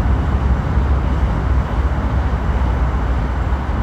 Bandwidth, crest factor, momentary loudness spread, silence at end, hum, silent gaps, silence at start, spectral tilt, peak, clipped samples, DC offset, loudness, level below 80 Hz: 6.4 kHz; 12 dB; 2 LU; 0 s; none; none; 0 s; -8.5 dB/octave; -4 dBFS; under 0.1%; under 0.1%; -19 LUFS; -18 dBFS